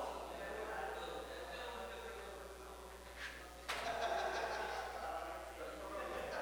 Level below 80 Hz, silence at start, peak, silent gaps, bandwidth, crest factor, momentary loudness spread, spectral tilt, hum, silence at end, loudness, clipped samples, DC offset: -60 dBFS; 0 s; -28 dBFS; none; over 20 kHz; 16 dB; 11 LU; -3 dB/octave; none; 0 s; -45 LUFS; under 0.1%; under 0.1%